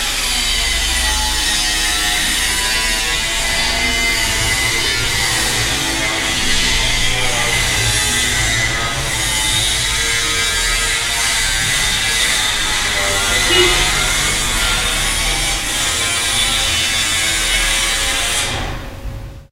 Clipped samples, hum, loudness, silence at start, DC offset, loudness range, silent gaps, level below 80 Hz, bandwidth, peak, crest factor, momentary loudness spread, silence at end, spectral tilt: under 0.1%; none; -14 LUFS; 0 s; under 0.1%; 1 LU; none; -26 dBFS; 16 kHz; 0 dBFS; 16 dB; 2 LU; 0.1 s; -1 dB/octave